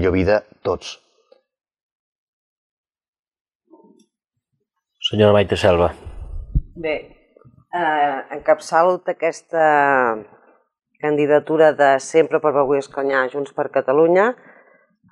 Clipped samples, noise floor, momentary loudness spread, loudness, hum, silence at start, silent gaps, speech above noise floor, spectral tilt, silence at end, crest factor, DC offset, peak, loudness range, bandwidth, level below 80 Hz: under 0.1%; -76 dBFS; 13 LU; -18 LUFS; none; 0 s; 1.83-2.84 s, 3.08-3.13 s, 3.19-3.24 s, 3.41-3.45 s, 3.55-3.60 s; 59 dB; -5.5 dB/octave; 0.8 s; 18 dB; under 0.1%; -2 dBFS; 6 LU; 11 kHz; -40 dBFS